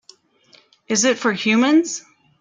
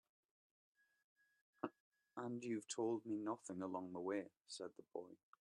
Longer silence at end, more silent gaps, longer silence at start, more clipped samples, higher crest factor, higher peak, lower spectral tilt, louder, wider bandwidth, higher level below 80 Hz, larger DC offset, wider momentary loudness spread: first, 0.4 s vs 0.25 s; second, none vs 1.80-1.91 s; second, 0.9 s vs 1.65 s; neither; second, 16 dB vs 22 dB; first, -4 dBFS vs -26 dBFS; second, -3 dB/octave vs -5 dB/octave; first, -18 LUFS vs -48 LUFS; second, 9.6 kHz vs 11.5 kHz; first, -66 dBFS vs under -90 dBFS; neither; about the same, 11 LU vs 11 LU